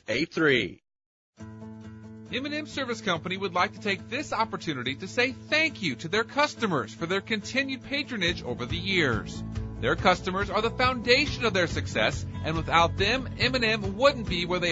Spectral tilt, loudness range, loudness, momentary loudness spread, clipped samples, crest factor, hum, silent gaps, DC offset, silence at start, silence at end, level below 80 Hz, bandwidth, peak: -4.5 dB/octave; 5 LU; -27 LUFS; 10 LU; under 0.1%; 20 dB; none; 1.06-1.33 s; under 0.1%; 0.1 s; 0 s; -46 dBFS; 8 kHz; -8 dBFS